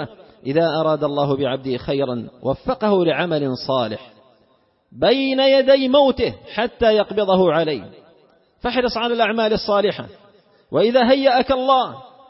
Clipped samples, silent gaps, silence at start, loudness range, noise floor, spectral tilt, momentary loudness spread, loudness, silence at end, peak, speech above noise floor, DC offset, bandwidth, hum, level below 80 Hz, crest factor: under 0.1%; none; 0 s; 5 LU; -60 dBFS; -9 dB/octave; 11 LU; -18 LUFS; 0.25 s; -2 dBFS; 42 dB; under 0.1%; 5.8 kHz; none; -48 dBFS; 18 dB